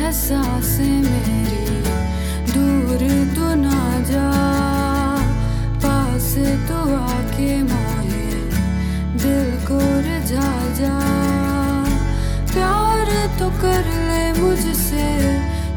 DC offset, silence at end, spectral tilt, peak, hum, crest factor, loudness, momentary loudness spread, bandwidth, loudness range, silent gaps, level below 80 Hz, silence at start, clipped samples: under 0.1%; 0 s; -6 dB/octave; -4 dBFS; none; 14 dB; -19 LUFS; 4 LU; 19 kHz; 2 LU; none; -24 dBFS; 0 s; under 0.1%